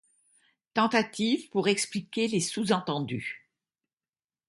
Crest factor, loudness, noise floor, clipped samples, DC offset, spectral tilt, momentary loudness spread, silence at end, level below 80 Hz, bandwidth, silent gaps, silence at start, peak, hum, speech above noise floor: 20 dB; -28 LUFS; under -90 dBFS; under 0.1%; under 0.1%; -4 dB/octave; 9 LU; 1.1 s; -72 dBFS; 11.5 kHz; none; 0.75 s; -10 dBFS; none; over 62 dB